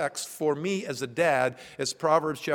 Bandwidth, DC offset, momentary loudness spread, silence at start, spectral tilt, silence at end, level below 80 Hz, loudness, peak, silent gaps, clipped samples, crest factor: 19 kHz; under 0.1%; 8 LU; 0 s; -4 dB/octave; 0 s; -70 dBFS; -27 LUFS; -8 dBFS; none; under 0.1%; 18 dB